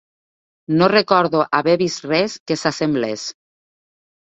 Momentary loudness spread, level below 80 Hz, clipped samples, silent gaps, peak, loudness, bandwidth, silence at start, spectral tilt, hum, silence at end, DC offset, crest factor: 8 LU; -60 dBFS; under 0.1%; 2.40-2.46 s; 0 dBFS; -18 LUFS; 8.4 kHz; 0.7 s; -5 dB/octave; none; 0.95 s; under 0.1%; 20 dB